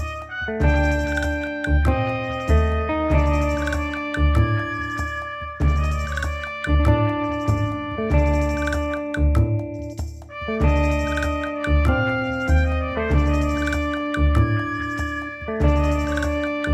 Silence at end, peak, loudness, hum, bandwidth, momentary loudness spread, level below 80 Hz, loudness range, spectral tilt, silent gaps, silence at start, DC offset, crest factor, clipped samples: 0 s; -4 dBFS; -22 LUFS; none; 8.8 kHz; 8 LU; -24 dBFS; 2 LU; -7 dB/octave; none; 0 s; under 0.1%; 16 dB; under 0.1%